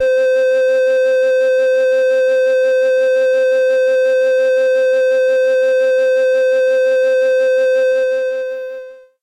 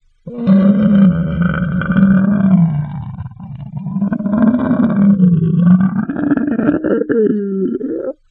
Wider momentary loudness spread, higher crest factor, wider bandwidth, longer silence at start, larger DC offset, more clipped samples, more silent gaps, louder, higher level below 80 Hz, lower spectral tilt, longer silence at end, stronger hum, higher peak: second, 2 LU vs 14 LU; second, 4 dB vs 14 dB; first, 9.2 kHz vs 3.9 kHz; second, 0 s vs 0.25 s; neither; neither; neither; about the same, -14 LUFS vs -14 LUFS; second, -70 dBFS vs -40 dBFS; second, -0.5 dB/octave vs -13 dB/octave; about the same, 0.25 s vs 0.2 s; neither; second, -10 dBFS vs 0 dBFS